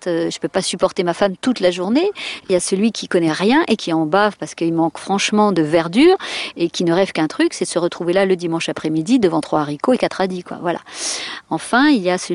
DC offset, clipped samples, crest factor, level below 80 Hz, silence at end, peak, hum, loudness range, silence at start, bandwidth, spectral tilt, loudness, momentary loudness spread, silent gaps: under 0.1%; under 0.1%; 14 dB; -56 dBFS; 0 s; -4 dBFS; none; 2 LU; 0 s; 11.5 kHz; -4.5 dB/octave; -18 LUFS; 8 LU; none